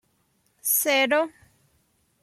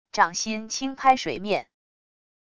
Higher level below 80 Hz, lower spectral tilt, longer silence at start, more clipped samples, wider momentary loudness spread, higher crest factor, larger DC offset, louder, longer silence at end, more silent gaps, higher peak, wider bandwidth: second, -74 dBFS vs -60 dBFS; second, 0 dB/octave vs -2.5 dB/octave; first, 0.65 s vs 0.15 s; neither; first, 11 LU vs 8 LU; about the same, 18 dB vs 22 dB; neither; about the same, -22 LUFS vs -24 LUFS; first, 0.95 s vs 0.75 s; neither; second, -10 dBFS vs -4 dBFS; first, 15.5 kHz vs 11 kHz